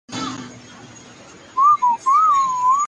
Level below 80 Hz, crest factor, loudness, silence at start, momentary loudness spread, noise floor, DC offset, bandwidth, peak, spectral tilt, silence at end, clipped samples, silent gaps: -62 dBFS; 12 dB; -16 LUFS; 0.1 s; 16 LU; -43 dBFS; under 0.1%; 9.6 kHz; -6 dBFS; -2.5 dB/octave; 0 s; under 0.1%; none